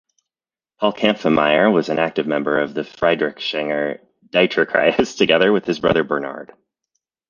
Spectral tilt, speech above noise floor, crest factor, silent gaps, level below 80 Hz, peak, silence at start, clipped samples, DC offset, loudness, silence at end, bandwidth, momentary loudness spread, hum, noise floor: -5.5 dB/octave; over 72 dB; 18 dB; none; -54 dBFS; 0 dBFS; 0.8 s; under 0.1%; under 0.1%; -18 LUFS; 0.85 s; 7.4 kHz; 8 LU; none; under -90 dBFS